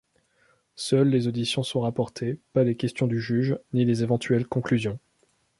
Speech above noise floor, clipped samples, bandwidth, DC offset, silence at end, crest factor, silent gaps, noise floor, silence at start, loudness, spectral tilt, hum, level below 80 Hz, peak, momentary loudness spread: 43 dB; under 0.1%; 11.5 kHz; under 0.1%; 0.6 s; 18 dB; none; -68 dBFS; 0.8 s; -25 LUFS; -6.5 dB/octave; none; -60 dBFS; -8 dBFS; 7 LU